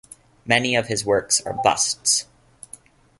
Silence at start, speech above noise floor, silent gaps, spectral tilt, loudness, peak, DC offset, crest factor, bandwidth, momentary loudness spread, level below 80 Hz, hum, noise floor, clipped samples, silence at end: 0.45 s; 26 dB; none; -2 dB/octave; -20 LUFS; -2 dBFS; under 0.1%; 22 dB; 12 kHz; 22 LU; -56 dBFS; none; -47 dBFS; under 0.1%; 0.95 s